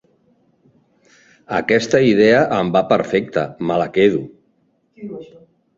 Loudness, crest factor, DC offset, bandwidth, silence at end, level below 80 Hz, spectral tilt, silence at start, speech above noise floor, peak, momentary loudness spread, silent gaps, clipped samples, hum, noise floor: -16 LUFS; 18 dB; under 0.1%; 7.8 kHz; 0.5 s; -54 dBFS; -6 dB/octave; 1.5 s; 46 dB; -2 dBFS; 21 LU; none; under 0.1%; none; -62 dBFS